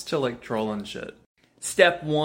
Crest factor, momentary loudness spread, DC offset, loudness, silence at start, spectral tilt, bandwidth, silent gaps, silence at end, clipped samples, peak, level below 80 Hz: 24 dB; 17 LU; under 0.1%; -24 LUFS; 0 s; -4 dB/octave; 16.5 kHz; 1.26-1.35 s; 0 s; under 0.1%; -2 dBFS; -60 dBFS